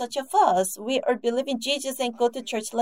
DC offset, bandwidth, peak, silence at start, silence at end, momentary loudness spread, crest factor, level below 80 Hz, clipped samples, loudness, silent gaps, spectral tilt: 0.1%; 16 kHz; -6 dBFS; 0 s; 0 s; 7 LU; 18 dB; -78 dBFS; under 0.1%; -25 LUFS; none; -2.5 dB/octave